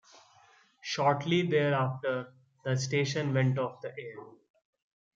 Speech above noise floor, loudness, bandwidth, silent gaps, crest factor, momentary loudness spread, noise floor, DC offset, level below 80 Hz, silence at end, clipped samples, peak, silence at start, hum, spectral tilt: 33 dB; -30 LUFS; 7.6 kHz; none; 20 dB; 17 LU; -62 dBFS; under 0.1%; -74 dBFS; 0.85 s; under 0.1%; -12 dBFS; 0.85 s; none; -5.5 dB/octave